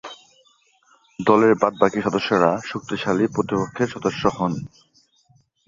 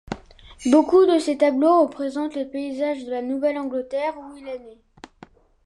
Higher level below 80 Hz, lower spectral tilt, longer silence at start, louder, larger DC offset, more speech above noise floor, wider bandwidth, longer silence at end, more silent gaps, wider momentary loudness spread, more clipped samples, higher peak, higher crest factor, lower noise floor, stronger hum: about the same, -56 dBFS vs -54 dBFS; about the same, -6 dB/octave vs -5 dB/octave; about the same, 0.05 s vs 0.1 s; about the same, -21 LUFS vs -21 LUFS; neither; first, 40 dB vs 29 dB; second, 7.6 kHz vs 11.5 kHz; about the same, 1 s vs 0.95 s; neither; second, 11 LU vs 19 LU; neither; about the same, -2 dBFS vs -4 dBFS; about the same, 20 dB vs 18 dB; first, -60 dBFS vs -50 dBFS; neither